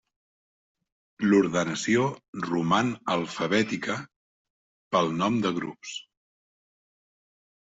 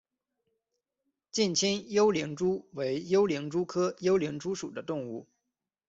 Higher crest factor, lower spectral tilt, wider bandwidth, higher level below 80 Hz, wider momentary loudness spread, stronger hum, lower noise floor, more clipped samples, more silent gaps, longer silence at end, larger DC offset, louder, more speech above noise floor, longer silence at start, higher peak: about the same, 20 dB vs 16 dB; about the same, -5 dB/octave vs -4.5 dB/octave; about the same, 8 kHz vs 8 kHz; about the same, -66 dBFS vs -70 dBFS; first, 13 LU vs 10 LU; neither; first, under -90 dBFS vs -86 dBFS; neither; first, 2.28-2.33 s, 4.16-4.91 s vs none; first, 1.75 s vs 0.65 s; neither; first, -26 LUFS vs -30 LUFS; first, over 64 dB vs 57 dB; second, 1.2 s vs 1.35 s; first, -8 dBFS vs -14 dBFS